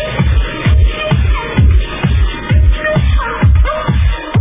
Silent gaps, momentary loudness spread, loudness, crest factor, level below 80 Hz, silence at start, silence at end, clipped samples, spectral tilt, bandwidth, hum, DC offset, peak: none; 3 LU; -13 LUFS; 10 dB; -12 dBFS; 0 s; 0 s; under 0.1%; -10.5 dB/octave; 3.8 kHz; none; under 0.1%; 0 dBFS